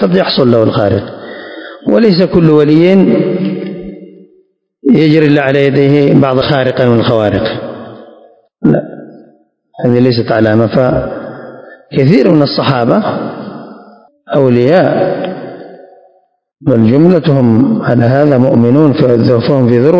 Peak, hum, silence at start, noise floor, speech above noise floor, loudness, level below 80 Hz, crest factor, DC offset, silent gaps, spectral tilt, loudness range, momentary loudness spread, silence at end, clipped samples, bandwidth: 0 dBFS; none; 0 s; -52 dBFS; 44 dB; -9 LUFS; -42 dBFS; 10 dB; under 0.1%; none; -9 dB/octave; 5 LU; 18 LU; 0 s; 2%; 7.2 kHz